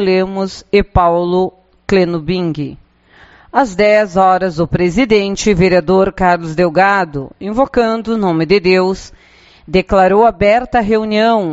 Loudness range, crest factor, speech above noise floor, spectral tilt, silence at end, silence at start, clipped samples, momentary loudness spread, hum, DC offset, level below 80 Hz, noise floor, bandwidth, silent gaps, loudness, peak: 3 LU; 12 dB; 33 dB; -5 dB/octave; 0 s; 0 s; under 0.1%; 8 LU; none; under 0.1%; -34 dBFS; -45 dBFS; 8 kHz; none; -13 LUFS; 0 dBFS